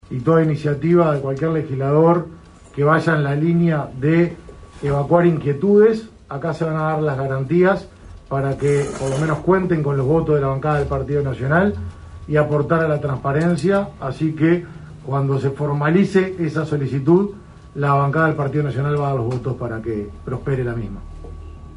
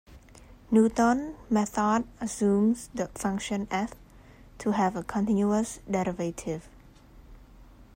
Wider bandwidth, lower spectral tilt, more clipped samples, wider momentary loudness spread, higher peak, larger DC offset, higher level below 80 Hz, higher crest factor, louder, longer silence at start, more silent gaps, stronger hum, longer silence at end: second, 11 kHz vs 16 kHz; first, -8.5 dB/octave vs -6 dB/octave; neither; about the same, 11 LU vs 11 LU; first, -4 dBFS vs -12 dBFS; neither; first, -42 dBFS vs -52 dBFS; about the same, 16 dB vs 18 dB; first, -19 LUFS vs -28 LUFS; about the same, 0.1 s vs 0.1 s; neither; neither; about the same, 0 s vs 0.1 s